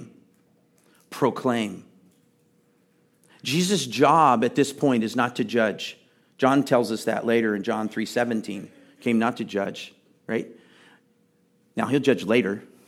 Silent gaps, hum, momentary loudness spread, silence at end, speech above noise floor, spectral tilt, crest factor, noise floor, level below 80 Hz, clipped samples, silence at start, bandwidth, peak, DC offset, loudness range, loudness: none; none; 16 LU; 0.2 s; 41 dB; -5 dB/octave; 22 dB; -64 dBFS; -76 dBFS; under 0.1%; 0 s; 16 kHz; -4 dBFS; under 0.1%; 8 LU; -24 LUFS